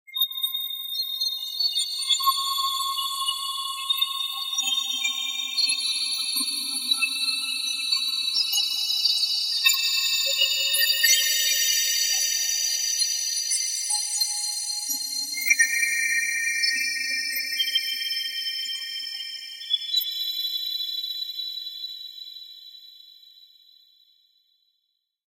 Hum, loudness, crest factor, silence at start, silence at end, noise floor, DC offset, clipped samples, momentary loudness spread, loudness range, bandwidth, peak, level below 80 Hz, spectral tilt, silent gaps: none; -23 LUFS; 22 dB; 0.1 s; 2 s; -76 dBFS; under 0.1%; under 0.1%; 9 LU; 8 LU; 16.5 kHz; -6 dBFS; -82 dBFS; 6 dB/octave; none